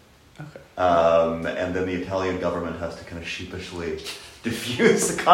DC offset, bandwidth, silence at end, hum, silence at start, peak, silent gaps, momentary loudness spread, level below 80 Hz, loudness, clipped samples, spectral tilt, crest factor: under 0.1%; 16 kHz; 0 s; none; 0.4 s; 0 dBFS; none; 16 LU; -50 dBFS; -24 LUFS; under 0.1%; -4 dB/octave; 22 dB